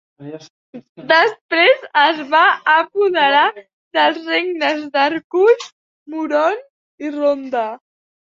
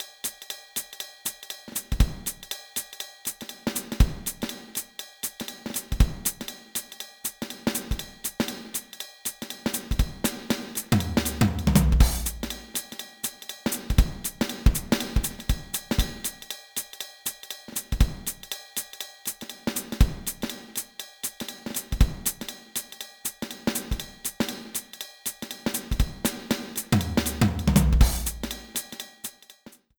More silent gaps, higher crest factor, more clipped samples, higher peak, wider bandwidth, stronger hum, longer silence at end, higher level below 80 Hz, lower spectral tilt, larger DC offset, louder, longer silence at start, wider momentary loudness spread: first, 0.50-0.73 s, 0.89-0.95 s, 1.41-1.49 s, 3.73-3.91 s, 5.24-5.30 s, 5.72-6.06 s, 6.70-6.98 s vs none; second, 16 dB vs 22 dB; neither; first, -2 dBFS vs -6 dBFS; second, 7.6 kHz vs over 20 kHz; neither; first, 0.5 s vs 0.3 s; second, -70 dBFS vs -30 dBFS; about the same, -3.5 dB/octave vs -4 dB/octave; neither; first, -16 LUFS vs -29 LUFS; first, 0.2 s vs 0 s; first, 16 LU vs 11 LU